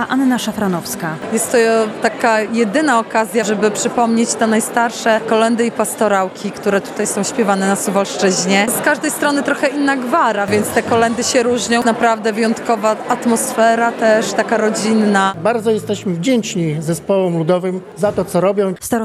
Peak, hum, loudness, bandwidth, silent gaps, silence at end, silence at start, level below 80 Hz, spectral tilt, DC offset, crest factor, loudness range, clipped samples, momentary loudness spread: 0 dBFS; none; -15 LUFS; 13.5 kHz; none; 0 s; 0 s; -56 dBFS; -4 dB/octave; under 0.1%; 16 dB; 1 LU; under 0.1%; 5 LU